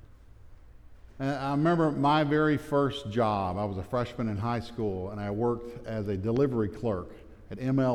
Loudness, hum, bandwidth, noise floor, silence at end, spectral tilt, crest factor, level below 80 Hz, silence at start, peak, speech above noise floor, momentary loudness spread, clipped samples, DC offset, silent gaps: -29 LUFS; none; 13 kHz; -51 dBFS; 0 s; -8 dB/octave; 16 dB; -52 dBFS; 0.05 s; -14 dBFS; 22 dB; 10 LU; under 0.1%; under 0.1%; none